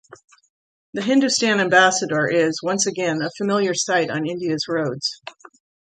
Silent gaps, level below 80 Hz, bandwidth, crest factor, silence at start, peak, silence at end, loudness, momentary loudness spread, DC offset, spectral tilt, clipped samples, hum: 0.50-0.93 s; -68 dBFS; 9.4 kHz; 18 dB; 0.1 s; -4 dBFS; 0.55 s; -20 LUFS; 11 LU; under 0.1%; -3.5 dB/octave; under 0.1%; none